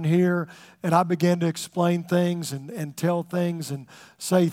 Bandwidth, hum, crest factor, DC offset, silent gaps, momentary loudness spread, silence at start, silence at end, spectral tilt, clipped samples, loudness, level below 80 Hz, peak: 16 kHz; none; 18 dB; under 0.1%; none; 12 LU; 0 s; 0 s; -6.5 dB/octave; under 0.1%; -25 LUFS; -74 dBFS; -6 dBFS